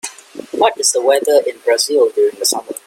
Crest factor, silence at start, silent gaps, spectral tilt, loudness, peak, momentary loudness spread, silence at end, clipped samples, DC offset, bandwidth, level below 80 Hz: 16 dB; 0.05 s; none; 0 dB/octave; -14 LUFS; 0 dBFS; 11 LU; 0.1 s; under 0.1%; under 0.1%; 16.5 kHz; -68 dBFS